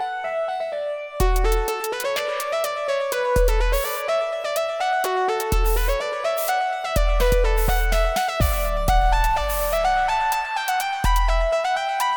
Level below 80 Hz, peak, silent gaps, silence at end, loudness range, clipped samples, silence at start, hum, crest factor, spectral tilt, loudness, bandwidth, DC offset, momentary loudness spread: -24 dBFS; -6 dBFS; none; 0 s; 2 LU; under 0.1%; 0 s; none; 14 dB; -4 dB/octave; -22 LUFS; 19.5 kHz; under 0.1%; 4 LU